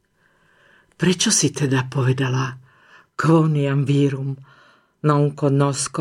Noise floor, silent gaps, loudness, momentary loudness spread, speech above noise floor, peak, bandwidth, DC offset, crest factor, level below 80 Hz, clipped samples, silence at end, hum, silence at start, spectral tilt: -61 dBFS; none; -19 LUFS; 11 LU; 42 dB; -4 dBFS; 13.5 kHz; under 0.1%; 16 dB; -62 dBFS; under 0.1%; 0 s; none; 1 s; -5 dB/octave